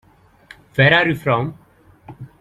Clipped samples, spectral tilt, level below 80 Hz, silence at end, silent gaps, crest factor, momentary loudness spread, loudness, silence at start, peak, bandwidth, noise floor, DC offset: under 0.1%; -7 dB/octave; -52 dBFS; 0.15 s; none; 20 dB; 16 LU; -16 LUFS; 0.75 s; -2 dBFS; 13.5 kHz; -47 dBFS; under 0.1%